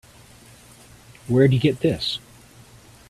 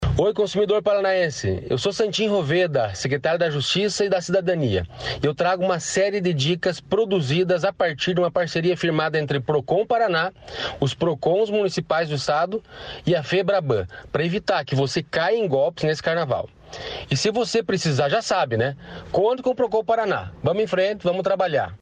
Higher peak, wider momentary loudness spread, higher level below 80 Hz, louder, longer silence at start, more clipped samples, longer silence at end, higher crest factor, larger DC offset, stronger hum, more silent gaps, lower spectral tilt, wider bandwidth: first, -4 dBFS vs -8 dBFS; first, 14 LU vs 5 LU; about the same, -52 dBFS vs -48 dBFS; about the same, -21 LUFS vs -22 LUFS; first, 1.3 s vs 0 s; neither; first, 0.9 s vs 0.05 s; first, 20 dB vs 14 dB; neither; neither; neither; first, -7 dB/octave vs -5 dB/octave; first, 13.5 kHz vs 9.8 kHz